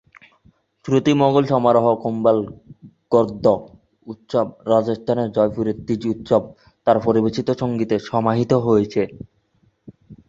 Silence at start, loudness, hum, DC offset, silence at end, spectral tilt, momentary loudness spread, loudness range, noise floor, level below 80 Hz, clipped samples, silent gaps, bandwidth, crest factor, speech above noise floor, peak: 0.85 s; -19 LUFS; none; under 0.1%; 0.15 s; -8 dB/octave; 8 LU; 3 LU; -62 dBFS; -54 dBFS; under 0.1%; none; 7.8 kHz; 18 dB; 43 dB; -2 dBFS